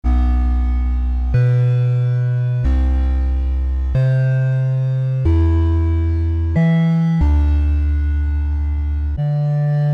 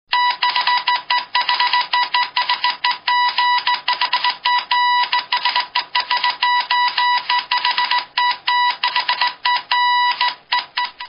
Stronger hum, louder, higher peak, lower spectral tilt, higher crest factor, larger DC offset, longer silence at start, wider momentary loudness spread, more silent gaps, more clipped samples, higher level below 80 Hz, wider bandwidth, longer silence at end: neither; about the same, -18 LUFS vs -17 LUFS; second, -6 dBFS vs 0 dBFS; first, -10 dB/octave vs 6 dB/octave; second, 10 dB vs 18 dB; neither; about the same, 0.05 s vs 0.1 s; about the same, 5 LU vs 3 LU; neither; neither; first, -18 dBFS vs -70 dBFS; second, 4.9 kHz vs 5.6 kHz; about the same, 0 s vs 0 s